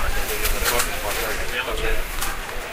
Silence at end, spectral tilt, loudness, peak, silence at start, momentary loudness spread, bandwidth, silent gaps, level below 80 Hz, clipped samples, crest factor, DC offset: 0 s; -2 dB/octave; -24 LUFS; -6 dBFS; 0 s; 6 LU; 16 kHz; none; -26 dBFS; under 0.1%; 16 dB; under 0.1%